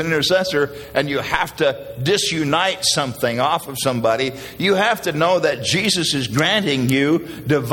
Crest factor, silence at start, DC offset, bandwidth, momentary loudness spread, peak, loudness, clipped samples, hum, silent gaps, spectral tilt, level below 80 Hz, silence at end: 18 dB; 0 s; under 0.1%; 17 kHz; 5 LU; 0 dBFS; -18 LUFS; under 0.1%; none; none; -4 dB/octave; -50 dBFS; 0 s